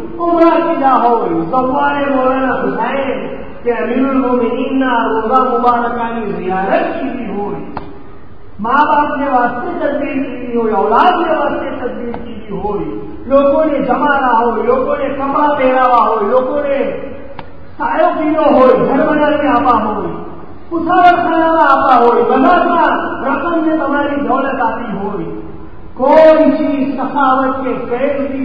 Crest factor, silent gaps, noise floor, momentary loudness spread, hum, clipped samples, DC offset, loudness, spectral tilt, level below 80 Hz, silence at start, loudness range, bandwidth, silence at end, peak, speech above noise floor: 14 dB; none; -37 dBFS; 12 LU; none; 0.2%; 4%; -13 LUFS; -8 dB/octave; -40 dBFS; 0 s; 5 LU; 5.6 kHz; 0 s; 0 dBFS; 24 dB